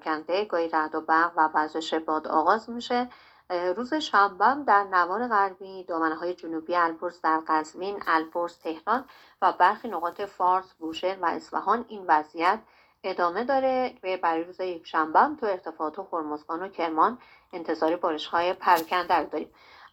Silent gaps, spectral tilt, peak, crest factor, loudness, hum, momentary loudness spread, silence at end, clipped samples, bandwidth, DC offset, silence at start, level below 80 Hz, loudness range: none; -4 dB/octave; -6 dBFS; 20 dB; -26 LUFS; none; 11 LU; 0.05 s; under 0.1%; 18 kHz; under 0.1%; 0.05 s; -70 dBFS; 3 LU